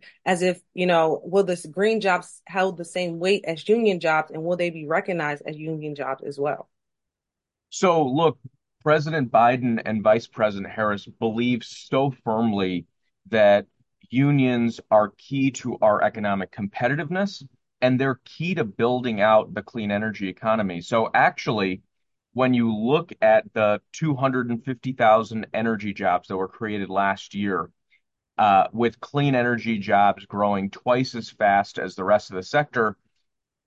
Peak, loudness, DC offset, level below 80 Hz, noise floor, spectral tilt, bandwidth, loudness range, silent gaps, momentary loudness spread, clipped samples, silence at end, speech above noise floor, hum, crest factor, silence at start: -6 dBFS; -23 LUFS; under 0.1%; -60 dBFS; -86 dBFS; -6 dB/octave; 11.5 kHz; 3 LU; none; 10 LU; under 0.1%; 0.75 s; 64 dB; none; 18 dB; 0.25 s